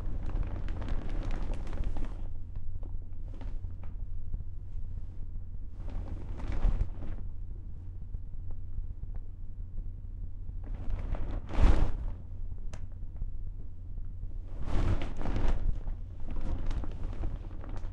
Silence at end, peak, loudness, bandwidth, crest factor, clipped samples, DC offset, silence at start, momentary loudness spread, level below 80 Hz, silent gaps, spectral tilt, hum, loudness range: 0 s; -8 dBFS; -40 LUFS; 4.7 kHz; 22 dB; under 0.1%; under 0.1%; 0 s; 11 LU; -34 dBFS; none; -7.5 dB/octave; none; 8 LU